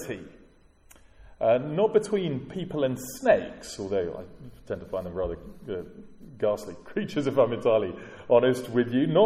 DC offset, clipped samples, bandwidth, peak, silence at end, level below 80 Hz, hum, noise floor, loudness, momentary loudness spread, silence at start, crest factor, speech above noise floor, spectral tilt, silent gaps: under 0.1%; under 0.1%; 16 kHz; -8 dBFS; 0 s; -54 dBFS; none; -56 dBFS; -27 LUFS; 14 LU; 0 s; 20 dB; 30 dB; -6 dB/octave; none